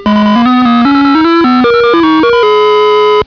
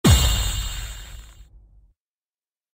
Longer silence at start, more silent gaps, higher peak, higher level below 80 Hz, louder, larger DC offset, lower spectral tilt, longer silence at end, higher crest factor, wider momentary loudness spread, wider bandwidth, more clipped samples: about the same, 0 s vs 0.05 s; neither; first, 0 dBFS vs -4 dBFS; second, -40 dBFS vs -28 dBFS; first, -7 LUFS vs -22 LUFS; first, 0.3% vs under 0.1%; first, -6.5 dB/octave vs -4 dB/octave; second, 0 s vs 1.3 s; second, 6 dB vs 20 dB; second, 0 LU vs 24 LU; second, 5.4 kHz vs 16.5 kHz; first, 2% vs under 0.1%